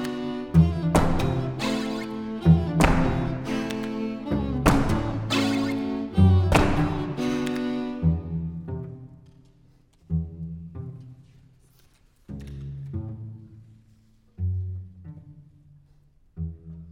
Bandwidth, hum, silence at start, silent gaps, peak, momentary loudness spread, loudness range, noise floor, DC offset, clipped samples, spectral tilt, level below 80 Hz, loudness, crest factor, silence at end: 16.5 kHz; none; 0 s; none; -2 dBFS; 19 LU; 15 LU; -58 dBFS; under 0.1%; under 0.1%; -7 dB/octave; -38 dBFS; -25 LUFS; 24 dB; 0 s